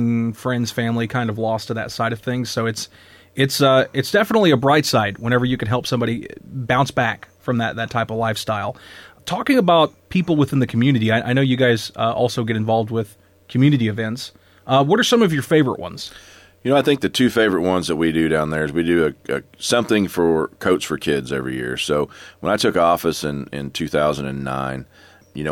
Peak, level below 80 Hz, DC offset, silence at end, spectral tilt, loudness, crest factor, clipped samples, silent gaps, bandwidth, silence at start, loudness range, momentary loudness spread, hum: -4 dBFS; -50 dBFS; under 0.1%; 0 s; -5.5 dB/octave; -19 LUFS; 14 dB; under 0.1%; none; 17.5 kHz; 0 s; 4 LU; 12 LU; none